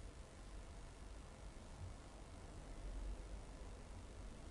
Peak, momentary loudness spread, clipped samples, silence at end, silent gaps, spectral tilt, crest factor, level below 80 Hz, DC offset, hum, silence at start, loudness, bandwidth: -40 dBFS; 5 LU; under 0.1%; 0 s; none; -5 dB/octave; 14 dB; -54 dBFS; under 0.1%; none; 0 s; -56 LUFS; 11.5 kHz